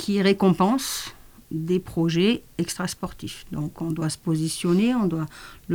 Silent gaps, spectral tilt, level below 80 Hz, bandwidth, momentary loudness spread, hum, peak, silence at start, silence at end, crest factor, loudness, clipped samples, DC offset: none; -5.5 dB/octave; -52 dBFS; over 20 kHz; 14 LU; none; -6 dBFS; 0 s; 0 s; 18 dB; -24 LUFS; under 0.1%; under 0.1%